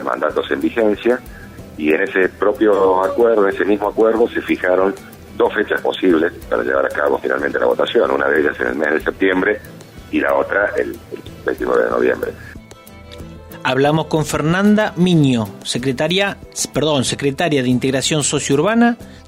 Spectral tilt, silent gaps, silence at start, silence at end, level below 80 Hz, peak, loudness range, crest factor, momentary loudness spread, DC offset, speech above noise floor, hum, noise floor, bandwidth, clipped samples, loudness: -5 dB/octave; none; 0 s; 0.05 s; -44 dBFS; -4 dBFS; 4 LU; 14 dB; 11 LU; under 0.1%; 23 dB; none; -39 dBFS; 16 kHz; under 0.1%; -17 LUFS